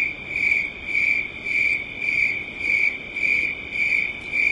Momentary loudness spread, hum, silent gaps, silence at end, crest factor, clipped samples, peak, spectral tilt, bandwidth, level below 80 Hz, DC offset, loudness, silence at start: 4 LU; none; none; 0 s; 16 dB; under 0.1%; -8 dBFS; -3 dB/octave; 11 kHz; -52 dBFS; under 0.1%; -21 LUFS; 0 s